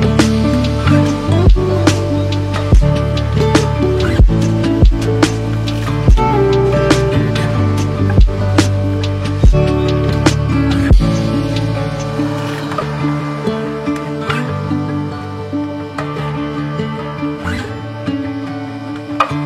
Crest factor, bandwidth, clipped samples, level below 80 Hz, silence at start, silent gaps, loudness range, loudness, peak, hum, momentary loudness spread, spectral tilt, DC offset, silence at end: 14 dB; 12.5 kHz; under 0.1%; -20 dBFS; 0 s; none; 7 LU; -15 LUFS; 0 dBFS; none; 9 LU; -6.5 dB/octave; under 0.1%; 0 s